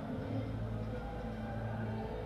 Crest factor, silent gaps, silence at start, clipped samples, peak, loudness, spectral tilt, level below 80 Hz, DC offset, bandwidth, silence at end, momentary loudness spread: 12 dB; none; 0 s; under 0.1%; -28 dBFS; -40 LUFS; -8.5 dB/octave; -48 dBFS; under 0.1%; 6.8 kHz; 0 s; 3 LU